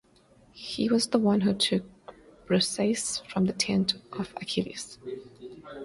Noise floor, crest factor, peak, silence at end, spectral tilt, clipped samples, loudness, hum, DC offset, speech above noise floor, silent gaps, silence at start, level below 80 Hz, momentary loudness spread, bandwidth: -59 dBFS; 20 dB; -10 dBFS; 0 s; -4.5 dB/octave; under 0.1%; -27 LUFS; none; under 0.1%; 32 dB; none; 0.55 s; -62 dBFS; 18 LU; 11.5 kHz